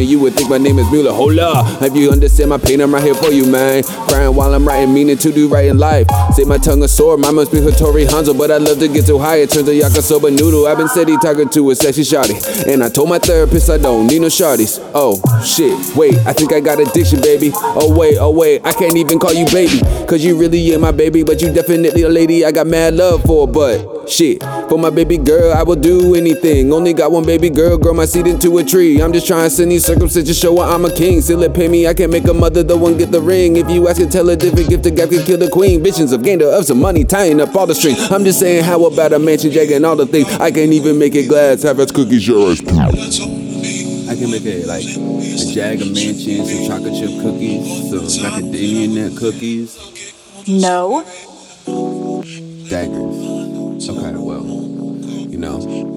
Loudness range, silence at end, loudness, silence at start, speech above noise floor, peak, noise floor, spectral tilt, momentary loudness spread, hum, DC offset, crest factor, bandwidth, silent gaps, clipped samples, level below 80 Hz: 8 LU; 0 s; -11 LUFS; 0 s; 23 dB; 0 dBFS; -33 dBFS; -5.5 dB/octave; 10 LU; none; under 0.1%; 10 dB; 20 kHz; none; under 0.1%; -22 dBFS